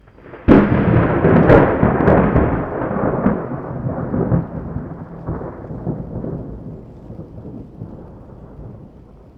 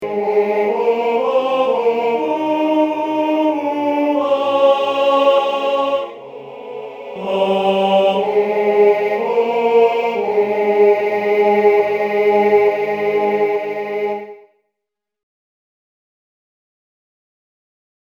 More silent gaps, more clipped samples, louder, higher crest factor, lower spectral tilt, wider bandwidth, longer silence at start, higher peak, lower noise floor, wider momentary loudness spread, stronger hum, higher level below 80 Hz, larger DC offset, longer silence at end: neither; neither; about the same, -16 LUFS vs -16 LUFS; about the same, 18 dB vs 14 dB; first, -11 dB/octave vs -6 dB/octave; second, 5.2 kHz vs 7.4 kHz; first, 0.25 s vs 0 s; about the same, 0 dBFS vs -2 dBFS; second, -42 dBFS vs -81 dBFS; first, 23 LU vs 9 LU; neither; first, -32 dBFS vs -68 dBFS; neither; second, 0.5 s vs 3.8 s